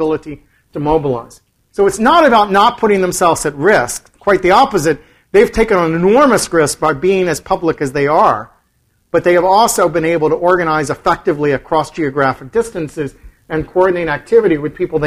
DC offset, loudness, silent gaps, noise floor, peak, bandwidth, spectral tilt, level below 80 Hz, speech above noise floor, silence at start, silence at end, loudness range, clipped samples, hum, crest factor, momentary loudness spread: under 0.1%; -13 LUFS; none; -59 dBFS; 0 dBFS; 16 kHz; -4.5 dB/octave; -38 dBFS; 47 dB; 0 s; 0 s; 4 LU; under 0.1%; none; 14 dB; 12 LU